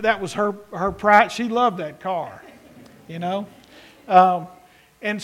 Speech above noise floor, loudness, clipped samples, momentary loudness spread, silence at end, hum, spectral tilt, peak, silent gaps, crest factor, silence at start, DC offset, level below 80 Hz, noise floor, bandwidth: 27 dB; -20 LUFS; under 0.1%; 16 LU; 0 s; none; -5 dB/octave; 0 dBFS; none; 22 dB; 0 s; under 0.1%; -54 dBFS; -47 dBFS; 14 kHz